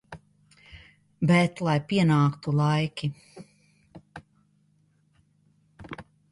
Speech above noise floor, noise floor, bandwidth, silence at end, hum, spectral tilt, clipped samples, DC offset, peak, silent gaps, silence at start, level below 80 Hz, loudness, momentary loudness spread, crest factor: 42 dB; -66 dBFS; 11.5 kHz; 0.3 s; none; -7 dB/octave; under 0.1%; under 0.1%; -10 dBFS; none; 0.1 s; -62 dBFS; -24 LUFS; 26 LU; 18 dB